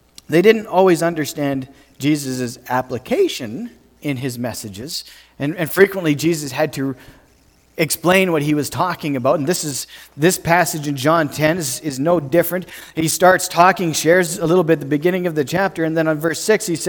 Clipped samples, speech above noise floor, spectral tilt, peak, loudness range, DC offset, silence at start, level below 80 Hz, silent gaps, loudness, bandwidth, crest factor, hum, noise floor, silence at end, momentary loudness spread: under 0.1%; 36 dB; -4.5 dB/octave; 0 dBFS; 6 LU; under 0.1%; 0.3 s; -54 dBFS; none; -18 LUFS; 19 kHz; 18 dB; none; -53 dBFS; 0 s; 13 LU